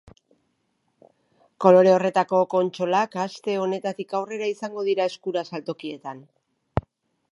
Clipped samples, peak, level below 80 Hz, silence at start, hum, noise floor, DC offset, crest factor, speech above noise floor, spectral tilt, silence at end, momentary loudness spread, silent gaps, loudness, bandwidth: under 0.1%; -2 dBFS; -52 dBFS; 1.6 s; none; -72 dBFS; under 0.1%; 22 dB; 50 dB; -6.5 dB/octave; 0.55 s; 16 LU; none; -23 LUFS; 11 kHz